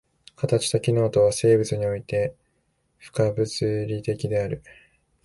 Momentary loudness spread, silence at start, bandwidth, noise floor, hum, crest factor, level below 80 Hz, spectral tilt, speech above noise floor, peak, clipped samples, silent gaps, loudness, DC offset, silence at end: 11 LU; 0.4 s; 11.5 kHz; -70 dBFS; none; 16 dB; -52 dBFS; -6 dB/octave; 47 dB; -8 dBFS; under 0.1%; none; -24 LUFS; under 0.1%; 0.65 s